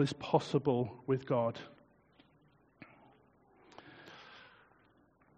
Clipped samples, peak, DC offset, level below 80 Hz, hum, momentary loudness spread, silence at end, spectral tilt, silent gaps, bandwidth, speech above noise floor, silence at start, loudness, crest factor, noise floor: under 0.1%; -14 dBFS; under 0.1%; -72 dBFS; none; 25 LU; 0.95 s; -6 dB/octave; none; 7.6 kHz; 35 dB; 0 s; -34 LUFS; 24 dB; -68 dBFS